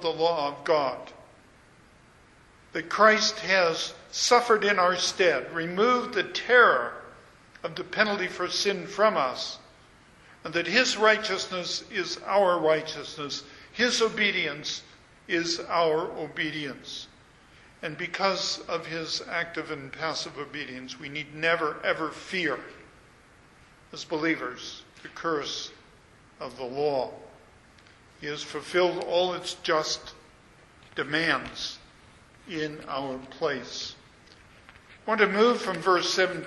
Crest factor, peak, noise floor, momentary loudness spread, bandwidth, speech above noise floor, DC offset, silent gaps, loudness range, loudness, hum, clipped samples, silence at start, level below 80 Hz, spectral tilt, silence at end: 24 dB; -4 dBFS; -56 dBFS; 17 LU; 11.5 kHz; 29 dB; under 0.1%; none; 10 LU; -26 LUFS; none; under 0.1%; 0 s; -64 dBFS; -3 dB/octave; 0 s